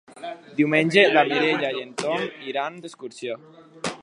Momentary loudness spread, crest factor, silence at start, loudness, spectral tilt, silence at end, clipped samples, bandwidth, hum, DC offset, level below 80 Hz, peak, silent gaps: 21 LU; 22 dB; 0.15 s; -22 LUFS; -4.5 dB/octave; 0.05 s; under 0.1%; 11.5 kHz; none; under 0.1%; -72 dBFS; -2 dBFS; none